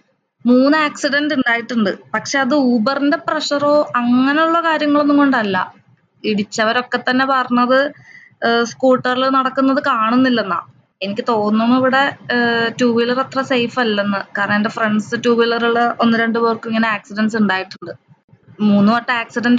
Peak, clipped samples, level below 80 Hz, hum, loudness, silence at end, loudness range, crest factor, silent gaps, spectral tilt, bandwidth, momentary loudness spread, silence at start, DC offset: -4 dBFS; under 0.1%; -66 dBFS; none; -16 LUFS; 0 s; 2 LU; 12 dB; 18.24-18.28 s; -5 dB/octave; 7.8 kHz; 7 LU; 0.45 s; under 0.1%